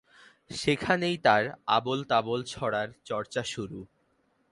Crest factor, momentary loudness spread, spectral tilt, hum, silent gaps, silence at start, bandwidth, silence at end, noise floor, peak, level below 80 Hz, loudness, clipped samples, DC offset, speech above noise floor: 22 dB; 12 LU; -4.5 dB/octave; none; none; 0.5 s; 11.5 kHz; 0.65 s; -70 dBFS; -8 dBFS; -62 dBFS; -28 LUFS; under 0.1%; under 0.1%; 42 dB